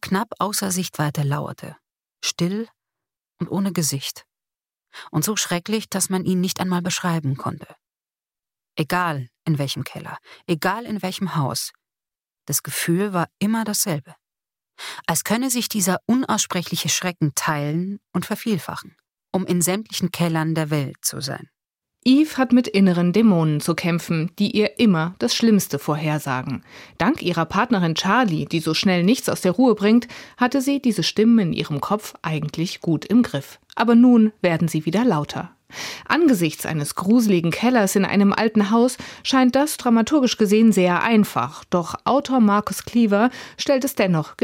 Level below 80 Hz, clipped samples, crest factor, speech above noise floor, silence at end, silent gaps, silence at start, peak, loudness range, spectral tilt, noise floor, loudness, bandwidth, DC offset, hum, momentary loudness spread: -60 dBFS; under 0.1%; 18 dB; over 70 dB; 0.1 s; none; 0.05 s; -2 dBFS; 7 LU; -5 dB/octave; under -90 dBFS; -20 LUFS; 17 kHz; under 0.1%; none; 11 LU